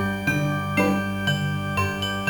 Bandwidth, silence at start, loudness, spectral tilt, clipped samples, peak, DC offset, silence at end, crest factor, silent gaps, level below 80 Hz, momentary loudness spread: 19 kHz; 0 s; -24 LUFS; -5.5 dB/octave; under 0.1%; -8 dBFS; 0.2%; 0 s; 16 dB; none; -50 dBFS; 3 LU